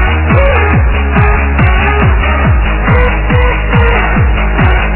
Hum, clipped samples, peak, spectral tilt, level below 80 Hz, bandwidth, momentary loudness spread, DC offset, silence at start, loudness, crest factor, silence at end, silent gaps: none; 0.4%; 0 dBFS; -10.5 dB/octave; -10 dBFS; 4 kHz; 2 LU; under 0.1%; 0 s; -10 LUFS; 8 dB; 0 s; none